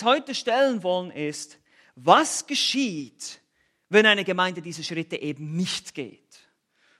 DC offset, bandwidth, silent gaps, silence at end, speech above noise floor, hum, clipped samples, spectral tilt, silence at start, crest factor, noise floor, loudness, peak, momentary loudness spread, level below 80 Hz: under 0.1%; 13.5 kHz; none; 0.9 s; 41 dB; none; under 0.1%; -3 dB/octave; 0 s; 24 dB; -65 dBFS; -23 LUFS; -2 dBFS; 18 LU; -78 dBFS